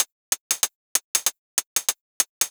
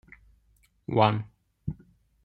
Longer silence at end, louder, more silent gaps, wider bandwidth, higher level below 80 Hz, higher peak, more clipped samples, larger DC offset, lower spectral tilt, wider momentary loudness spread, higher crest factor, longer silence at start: second, 0 s vs 0.5 s; first, -24 LUFS vs -28 LUFS; first, 0.12-0.32 s, 0.40-0.50 s, 0.75-0.95 s, 1.04-1.14 s, 1.38-1.57 s, 1.66-1.76 s, 2.01-2.20 s, 2.29-2.41 s vs none; first, over 20 kHz vs 5.4 kHz; second, -78 dBFS vs -58 dBFS; first, -2 dBFS vs -6 dBFS; neither; neither; second, 3 dB/octave vs -9 dB/octave; second, 5 LU vs 22 LU; about the same, 24 dB vs 24 dB; second, 0 s vs 0.9 s